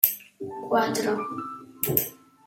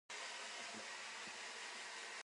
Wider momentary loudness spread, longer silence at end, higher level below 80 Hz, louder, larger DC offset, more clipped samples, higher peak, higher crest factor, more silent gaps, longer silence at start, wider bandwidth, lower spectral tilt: first, 13 LU vs 1 LU; first, 0.3 s vs 0.05 s; first, -64 dBFS vs under -90 dBFS; first, -27 LUFS vs -48 LUFS; neither; neither; first, 0 dBFS vs -36 dBFS; first, 28 dB vs 16 dB; neither; about the same, 0 s vs 0.1 s; first, 17 kHz vs 11.5 kHz; first, -4 dB/octave vs 0.5 dB/octave